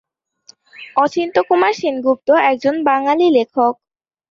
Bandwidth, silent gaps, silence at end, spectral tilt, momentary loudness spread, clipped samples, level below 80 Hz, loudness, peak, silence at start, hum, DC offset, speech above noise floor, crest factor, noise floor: 7.4 kHz; none; 0.6 s; -4.5 dB/octave; 5 LU; under 0.1%; -64 dBFS; -15 LUFS; -2 dBFS; 0.8 s; none; under 0.1%; 35 dB; 14 dB; -50 dBFS